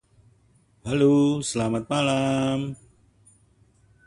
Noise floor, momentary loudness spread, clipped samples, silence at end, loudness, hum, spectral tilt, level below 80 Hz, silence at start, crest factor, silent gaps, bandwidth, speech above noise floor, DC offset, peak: -61 dBFS; 15 LU; under 0.1%; 1.3 s; -23 LUFS; none; -5.5 dB/octave; -56 dBFS; 0.85 s; 16 dB; none; 11.5 kHz; 39 dB; under 0.1%; -8 dBFS